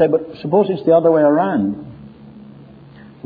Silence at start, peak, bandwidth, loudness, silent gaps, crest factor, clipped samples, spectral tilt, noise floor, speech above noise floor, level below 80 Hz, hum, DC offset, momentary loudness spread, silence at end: 0 s; -2 dBFS; 4.9 kHz; -15 LUFS; none; 14 dB; under 0.1%; -11 dB/octave; -41 dBFS; 26 dB; -56 dBFS; none; under 0.1%; 12 LU; 0.8 s